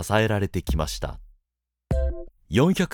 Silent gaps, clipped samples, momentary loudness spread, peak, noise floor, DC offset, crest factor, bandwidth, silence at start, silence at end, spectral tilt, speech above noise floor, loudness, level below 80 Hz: none; under 0.1%; 12 LU; -6 dBFS; -83 dBFS; under 0.1%; 20 dB; 19 kHz; 0 s; 0 s; -6 dB/octave; 61 dB; -25 LUFS; -32 dBFS